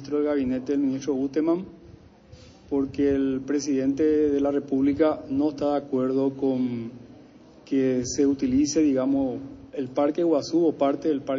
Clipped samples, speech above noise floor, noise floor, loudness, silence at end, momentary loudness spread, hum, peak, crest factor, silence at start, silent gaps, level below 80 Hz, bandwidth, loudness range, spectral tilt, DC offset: under 0.1%; 26 dB; -50 dBFS; -24 LUFS; 0 s; 7 LU; none; -8 dBFS; 16 dB; 0 s; none; -54 dBFS; 7.6 kHz; 3 LU; -6 dB/octave; under 0.1%